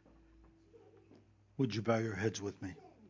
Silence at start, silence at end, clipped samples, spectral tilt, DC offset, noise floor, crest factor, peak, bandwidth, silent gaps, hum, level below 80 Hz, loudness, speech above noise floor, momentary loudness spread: 0.75 s; 0 s; under 0.1%; -6 dB/octave; under 0.1%; -64 dBFS; 22 dB; -18 dBFS; 7.6 kHz; none; none; -66 dBFS; -38 LUFS; 28 dB; 14 LU